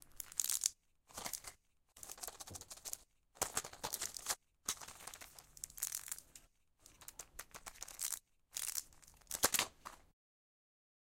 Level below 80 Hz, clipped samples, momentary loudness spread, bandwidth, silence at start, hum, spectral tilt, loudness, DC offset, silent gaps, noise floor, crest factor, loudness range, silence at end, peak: -70 dBFS; under 0.1%; 18 LU; 17 kHz; 0 s; none; 0.5 dB/octave; -42 LUFS; under 0.1%; none; -68 dBFS; 34 dB; 5 LU; 1.15 s; -12 dBFS